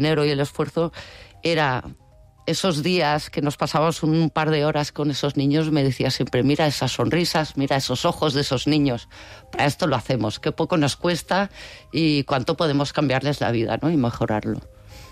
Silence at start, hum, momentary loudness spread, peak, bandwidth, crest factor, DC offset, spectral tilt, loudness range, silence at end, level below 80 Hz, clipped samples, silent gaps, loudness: 0 s; none; 8 LU; -10 dBFS; 15 kHz; 12 dB; under 0.1%; -5.5 dB/octave; 2 LU; 0 s; -48 dBFS; under 0.1%; none; -22 LUFS